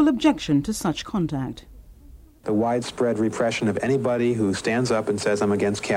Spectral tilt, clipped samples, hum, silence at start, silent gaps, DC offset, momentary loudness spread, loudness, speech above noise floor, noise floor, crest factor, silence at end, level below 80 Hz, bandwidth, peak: -5.5 dB/octave; under 0.1%; none; 0 s; none; under 0.1%; 5 LU; -23 LUFS; 25 dB; -47 dBFS; 16 dB; 0 s; -48 dBFS; 15.5 kHz; -8 dBFS